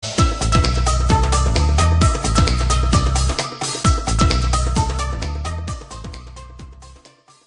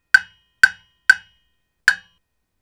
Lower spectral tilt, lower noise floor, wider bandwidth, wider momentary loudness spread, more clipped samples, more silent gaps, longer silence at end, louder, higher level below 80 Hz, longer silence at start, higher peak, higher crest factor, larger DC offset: first, -4.5 dB/octave vs 1.5 dB/octave; second, -49 dBFS vs -69 dBFS; second, 11 kHz vs over 20 kHz; first, 16 LU vs 4 LU; second, under 0.1% vs 0.1%; neither; second, 0.5 s vs 0.65 s; about the same, -18 LUFS vs -17 LUFS; first, -20 dBFS vs -56 dBFS; second, 0 s vs 0.15 s; about the same, 0 dBFS vs 0 dBFS; about the same, 18 dB vs 20 dB; neither